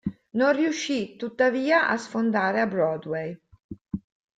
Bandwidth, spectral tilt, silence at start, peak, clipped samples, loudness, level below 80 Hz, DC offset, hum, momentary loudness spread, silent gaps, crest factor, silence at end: 9.2 kHz; -5 dB/octave; 0.05 s; -8 dBFS; under 0.1%; -24 LUFS; -60 dBFS; under 0.1%; none; 15 LU; 3.64-3.69 s; 18 dB; 0.4 s